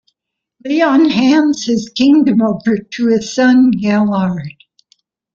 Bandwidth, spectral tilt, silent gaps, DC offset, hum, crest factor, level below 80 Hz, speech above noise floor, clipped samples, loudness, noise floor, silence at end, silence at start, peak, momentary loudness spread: 7.6 kHz; -5.5 dB/octave; none; under 0.1%; none; 12 dB; -54 dBFS; 64 dB; under 0.1%; -13 LUFS; -76 dBFS; 0.85 s; 0.65 s; -2 dBFS; 9 LU